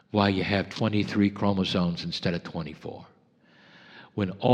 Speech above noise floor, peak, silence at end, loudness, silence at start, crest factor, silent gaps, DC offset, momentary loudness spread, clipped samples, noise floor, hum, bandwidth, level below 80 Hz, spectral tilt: 34 dB; -6 dBFS; 0 s; -27 LUFS; 0.15 s; 22 dB; none; under 0.1%; 14 LU; under 0.1%; -60 dBFS; none; 9.2 kHz; -60 dBFS; -7 dB/octave